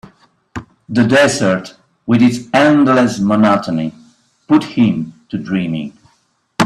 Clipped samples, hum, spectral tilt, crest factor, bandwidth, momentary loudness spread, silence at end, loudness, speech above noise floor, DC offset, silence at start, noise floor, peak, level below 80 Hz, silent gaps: under 0.1%; none; -5.5 dB/octave; 14 dB; 12.5 kHz; 20 LU; 0 s; -14 LUFS; 47 dB; under 0.1%; 0.55 s; -60 dBFS; 0 dBFS; -52 dBFS; none